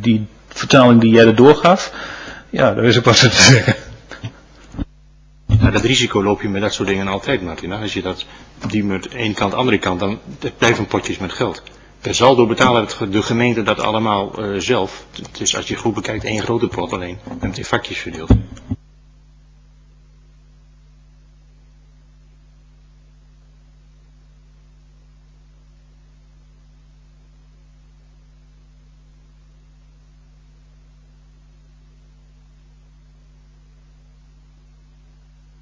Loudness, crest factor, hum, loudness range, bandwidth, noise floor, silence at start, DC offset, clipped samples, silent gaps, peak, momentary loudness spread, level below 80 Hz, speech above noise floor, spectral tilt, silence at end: -15 LUFS; 18 dB; none; 11 LU; 8 kHz; -47 dBFS; 0 s; under 0.1%; under 0.1%; none; 0 dBFS; 21 LU; -36 dBFS; 32 dB; -4.5 dB/octave; 16.85 s